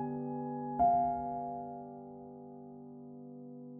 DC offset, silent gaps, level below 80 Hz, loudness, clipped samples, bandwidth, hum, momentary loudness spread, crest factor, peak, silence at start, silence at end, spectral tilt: under 0.1%; none; -64 dBFS; -35 LUFS; under 0.1%; 2.7 kHz; none; 21 LU; 18 dB; -20 dBFS; 0 s; 0 s; -11 dB/octave